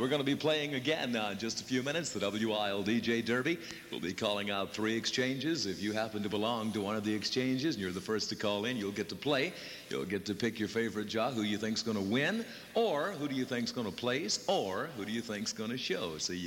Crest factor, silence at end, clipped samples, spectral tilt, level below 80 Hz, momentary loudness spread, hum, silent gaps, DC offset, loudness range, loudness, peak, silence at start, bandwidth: 16 dB; 0 s; under 0.1%; -4 dB/octave; -70 dBFS; 6 LU; none; none; under 0.1%; 2 LU; -34 LUFS; -18 dBFS; 0 s; 16.5 kHz